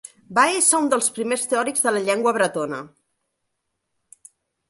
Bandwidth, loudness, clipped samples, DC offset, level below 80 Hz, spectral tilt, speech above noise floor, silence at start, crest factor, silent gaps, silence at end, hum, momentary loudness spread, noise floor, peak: 12 kHz; -20 LUFS; under 0.1%; under 0.1%; -72 dBFS; -2 dB/octave; 56 dB; 0.3 s; 20 dB; none; 1.85 s; none; 10 LU; -77 dBFS; -2 dBFS